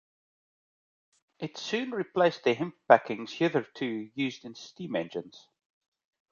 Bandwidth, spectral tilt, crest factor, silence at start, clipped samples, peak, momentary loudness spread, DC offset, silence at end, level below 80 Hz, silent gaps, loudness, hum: 7.2 kHz; -5.5 dB/octave; 26 dB; 1.4 s; under 0.1%; -4 dBFS; 18 LU; under 0.1%; 0.95 s; -78 dBFS; none; -29 LUFS; none